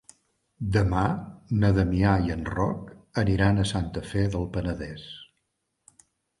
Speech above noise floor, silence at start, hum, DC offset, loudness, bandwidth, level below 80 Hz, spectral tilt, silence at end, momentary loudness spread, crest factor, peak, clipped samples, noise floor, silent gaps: 53 dB; 0.6 s; none; under 0.1%; -26 LUFS; 11.5 kHz; -40 dBFS; -7 dB/octave; 1.15 s; 13 LU; 18 dB; -8 dBFS; under 0.1%; -77 dBFS; none